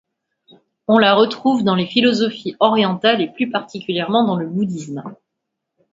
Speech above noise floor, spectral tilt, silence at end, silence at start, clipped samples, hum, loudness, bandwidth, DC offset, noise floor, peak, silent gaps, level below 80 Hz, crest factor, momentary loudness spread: 62 dB; -6 dB/octave; 0.8 s; 0.9 s; under 0.1%; none; -17 LUFS; 7.8 kHz; under 0.1%; -78 dBFS; 0 dBFS; none; -64 dBFS; 18 dB; 12 LU